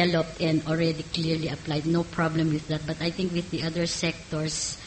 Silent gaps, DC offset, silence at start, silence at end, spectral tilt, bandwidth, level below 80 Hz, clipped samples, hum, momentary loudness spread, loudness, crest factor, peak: none; under 0.1%; 0 s; 0 s; -5 dB/octave; 8.8 kHz; -50 dBFS; under 0.1%; none; 4 LU; -27 LUFS; 16 dB; -10 dBFS